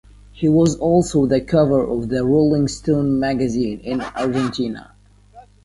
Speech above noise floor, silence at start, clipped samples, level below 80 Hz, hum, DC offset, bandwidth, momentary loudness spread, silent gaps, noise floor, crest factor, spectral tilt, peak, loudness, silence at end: 28 dB; 0.35 s; under 0.1%; -42 dBFS; 50 Hz at -40 dBFS; under 0.1%; 11.5 kHz; 8 LU; none; -46 dBFS; 16 dB; -7 dB/octave; -4 dBFS; -18 LUFS; 0.25 s